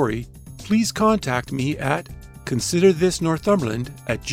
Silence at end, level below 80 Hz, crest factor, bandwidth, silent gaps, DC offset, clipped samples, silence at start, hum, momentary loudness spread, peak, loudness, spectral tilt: 0 s; -44 dBFS; 16 dB; 16 kHz; none; under 0.1%; under 0.1%; 0 s; none; 14 LU; -4 dBFS; -21 LUFS; -5.5 dB/octave